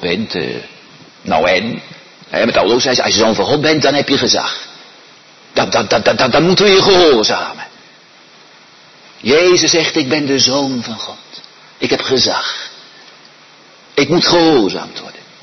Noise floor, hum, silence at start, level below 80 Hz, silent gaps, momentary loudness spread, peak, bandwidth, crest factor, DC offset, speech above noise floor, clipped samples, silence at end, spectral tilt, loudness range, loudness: -43 dBFS; none; 0 s; -48 dBFS; none; 18 LU; 0 dBFS; 6.4 kHz; 14 dB; under 0.1%; 30 dB; under 0.1%; 0.25 s; -3.5 dB/octave; 4 LU; -12 LUFS